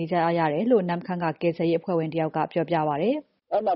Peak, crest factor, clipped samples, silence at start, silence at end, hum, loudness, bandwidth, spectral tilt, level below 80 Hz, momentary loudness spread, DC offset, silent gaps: -10 dBFS; 16 dB; under 0.1%; 0 s; 0 s; none; -25 LUFS; 5.6 kHz; -6 dB/octave; -66 dBFS; 6 LU; under 0.1%; none